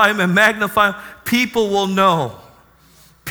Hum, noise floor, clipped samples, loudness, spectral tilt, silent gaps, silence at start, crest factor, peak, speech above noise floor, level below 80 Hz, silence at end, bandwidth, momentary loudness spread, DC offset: none; -50 dBFS; under 0.1%; -16 LUFS; -4.5 dB/octave; none; 0 s; 18 dB; 0 dBFS; 33 dB; -52 dBFS; 0 s; over 20 kHz; 12 LU; under 0.1%